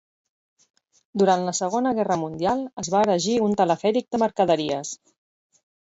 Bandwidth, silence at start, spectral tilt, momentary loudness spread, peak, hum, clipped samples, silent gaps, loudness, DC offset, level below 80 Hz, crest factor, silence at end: 8.2 kHz; 1.15 s; -4.5 dB/octave; 7 LU; -6 dBFS; none; under 0.1%; 2.73-2.77 s; -23 LUFS; under 0.1%; -62 dBFS; 18 dB; 1 s